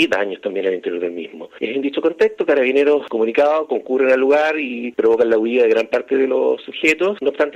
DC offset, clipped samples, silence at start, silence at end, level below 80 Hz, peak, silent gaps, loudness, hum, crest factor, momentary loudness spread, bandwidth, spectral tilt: under 0.1%; under 0.1%; 0 s; 0 s; -64 dBFS; -2 dBFS; none; -17 LUFS; none; 14 dB; 9 LU; 9 kHz; -4.5 dB/octave